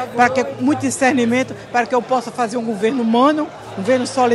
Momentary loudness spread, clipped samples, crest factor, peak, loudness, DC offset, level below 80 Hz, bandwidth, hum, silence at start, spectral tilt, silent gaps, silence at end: 6 LU; under 0.1%; 18 dB; 0 dBFS; -18 LUFS; under 0.1%; -60 dBFS; 12.5 kHz; none; 0 s; -4.5 dB/octave; none; 0 s